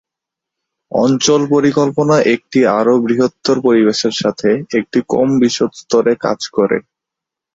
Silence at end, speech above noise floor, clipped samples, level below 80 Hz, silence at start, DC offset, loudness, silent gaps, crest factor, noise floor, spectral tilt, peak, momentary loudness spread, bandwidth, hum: 0.75 s; 70 dB; under 0.1%; -56 dBFS; 0.9 s; under 0.1%; -14 LUFS; none; 12 dB; -83 dBFS; -5 dB/octave; -2 dBFS; 5 LU; 8 kHz; none